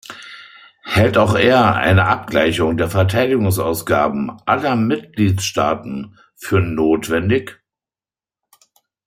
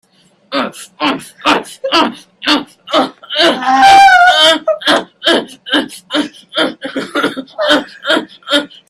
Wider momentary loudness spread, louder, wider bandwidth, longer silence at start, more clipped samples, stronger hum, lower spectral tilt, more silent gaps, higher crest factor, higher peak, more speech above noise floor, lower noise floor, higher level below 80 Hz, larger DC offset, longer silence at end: first, 19 LU vs 13 LU; second, -16 LUFS vs -12 LUFS; first, 16 kHz vs 14.5 kHz; second, 0.1 s vs 0.5 s; second, under 0.1% vs 0.1%; neither; first, -6 dB/octave vs -2 dB/octave; neither; about the same, 16 dB vs 12 dB; about the same, -2 dBFS vs 0 dBFS; first, over 74 dB vs 25 dB; first, under -90 dBFS vs -41 dBFS; first, -46 dBFS vs -54 dBFS; neither; first, 1.55 s vs 0.25 s